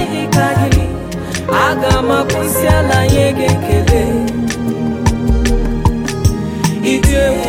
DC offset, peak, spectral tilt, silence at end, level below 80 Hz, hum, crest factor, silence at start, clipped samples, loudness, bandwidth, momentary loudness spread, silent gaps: under 0.1%; 0 dBFS; -5.5 dB/octave; 0 s; -20 dBFS; none; 12 dB; 0 s; under 0.1%; -14 LUFS; 17 kHz; 6 LU; none